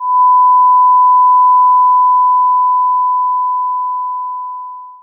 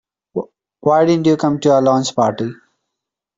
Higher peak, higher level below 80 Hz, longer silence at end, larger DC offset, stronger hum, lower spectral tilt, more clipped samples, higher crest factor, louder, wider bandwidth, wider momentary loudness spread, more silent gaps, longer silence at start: about the same, -4 dBFS vs -2 dBFS; second, under -90 dBFS vs -58 dBFS; second, 0.1 s vs 0.85 s; neither; neither; second, -1.5 dB/octave vs -6 dB/octave; neither; second, 6 dB vs 14 dB; first, -10 LUFS vs -15 LUFS; second, 1.1 kHz vs 7.8 kHz; about the same, 13 LU vs 14 LU; neither; second, 0 s vs 0.35 s